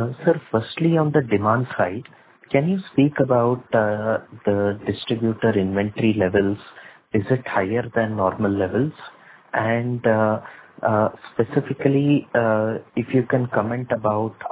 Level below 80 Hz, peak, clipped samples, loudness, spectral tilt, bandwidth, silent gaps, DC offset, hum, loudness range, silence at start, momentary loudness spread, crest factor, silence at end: -52 dBFS; -2 dBFS; under 0.1%; -21 LUFS; -11.5 dB/octave; 4 kHz; none; under 0.1%; none; 2 LU; 0 s; 6 LU; 18 dB; 0 s